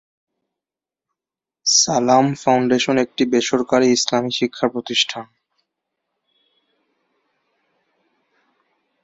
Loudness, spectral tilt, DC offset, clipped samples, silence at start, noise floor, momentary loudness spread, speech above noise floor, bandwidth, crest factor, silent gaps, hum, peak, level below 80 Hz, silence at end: -17 LUFS; -3 dB/octave; under 0.1%; under 0.1%; 1.65 s; -89 dBFS; 7 LU; 71 dB; 8 kHz; 20 dB; none; none; -2 dBFS; -64 dBFS; 3.8 s